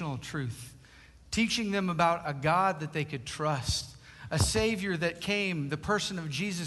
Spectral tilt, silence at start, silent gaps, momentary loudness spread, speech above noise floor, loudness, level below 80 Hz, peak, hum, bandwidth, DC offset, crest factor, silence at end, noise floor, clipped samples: -4.5 dB/octave; 0 s; none; 10 LU; 25 dB; -30 LUFS; -48 dBFS; -12 dBFS; none; 12.5 kHz; under 0.1%; 18 dB; 0 s; -55 dBFS; under 0.1%